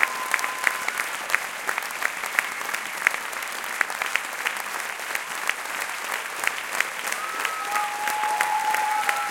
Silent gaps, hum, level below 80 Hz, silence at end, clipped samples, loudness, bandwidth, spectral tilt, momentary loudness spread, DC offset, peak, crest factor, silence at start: none; none; -74 dBFS; 0 s; under 0.1%; -26 LUFS; 17 kHz; 1 dB/octave; 5 LU; under 0.1%; 0 dBFS; 26 dB; 0 s